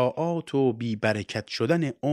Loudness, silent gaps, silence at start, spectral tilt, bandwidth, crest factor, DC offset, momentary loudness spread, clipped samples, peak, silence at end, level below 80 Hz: -27 LUFS; none; 0 s; -6.5 dB/octave; 12 kHz; 18 dB; under 0.1%; 4 LU; under 0.1%; -8 dBFS; 0 s; -66 dBFS